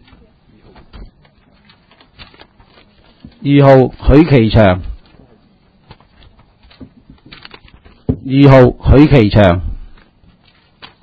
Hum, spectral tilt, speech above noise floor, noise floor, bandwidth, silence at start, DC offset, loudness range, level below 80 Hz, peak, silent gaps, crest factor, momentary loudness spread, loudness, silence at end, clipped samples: none; -9.5 dB/octave; 43 dB; -50 dBFS; 6.2 kHz; 1 s; under 0.1%; 8 LU; -26 dBFS; 0 dBFS; none; 14 dB; 15 LU; -9 LUFS; 1.2 s; 0.7%